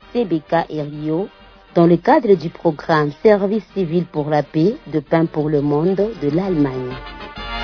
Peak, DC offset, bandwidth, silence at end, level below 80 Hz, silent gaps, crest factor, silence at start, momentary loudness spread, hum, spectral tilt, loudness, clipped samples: 0 dBFS; under 0.1%; 5.4 kHz; 0 s; -44 dBFS; none; 18 dB; 0.15 s; 11 LU; none; -9 dB/octave; -18 LUFS; under 0.1%